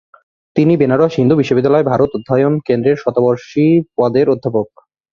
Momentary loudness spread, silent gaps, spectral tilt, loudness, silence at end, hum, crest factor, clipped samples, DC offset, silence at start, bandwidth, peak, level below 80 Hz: 4 LU; none; -8.5 dB/octave; -14 LUFS; 0.45 s; none; 14 dB; under 0.1%; under 0.1%; 0.55 s; 7 kHz; 0 dBFS; -50 dBFS